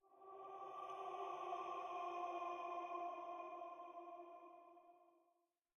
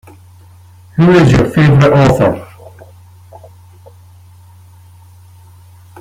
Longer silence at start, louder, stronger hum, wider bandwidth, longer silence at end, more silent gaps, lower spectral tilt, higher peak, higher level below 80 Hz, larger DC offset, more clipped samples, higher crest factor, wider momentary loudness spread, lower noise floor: second, 0.05 s vs 0.95 s; second, -50 LUFS vs -9 LUFS; neither; second, 10.5 kHz vs 13 kHz; second, 0.6 s vs 3.55 s; neither; second, -4 dB/octave vs -7.5 dB/octave; second, -36 dBFS vs 0 dBFS; second, under -90 dBFS vs -36 dBFS; neither; neither; about the same, 16 dB vs 14 dB; first, 15 LU vs 10 LU; first, -85 dBFS vs -40 dBFS